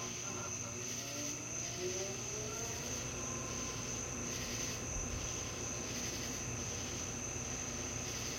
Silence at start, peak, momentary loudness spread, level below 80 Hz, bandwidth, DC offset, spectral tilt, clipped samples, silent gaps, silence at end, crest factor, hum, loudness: 0 s; -28 dBFS; 1 LU; -56 dBFS; 16.5 kHz; under 0.1%; -2.5 dB/octave; under 0.1%; none; 0 s; 14 dB; none; -39 LUFS